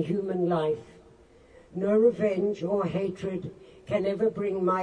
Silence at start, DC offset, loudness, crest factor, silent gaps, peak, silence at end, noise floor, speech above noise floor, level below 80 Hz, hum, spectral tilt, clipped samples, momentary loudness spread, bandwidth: 0 s; under 0.1%; -27 LUFS; 16 dB; none; -12 dBFS; 0 s; -55 dBFS; 29 dB; -62 dBFS; none; -8.5 dB/octave; under 0.1%; 12 LU; 9.6 kHz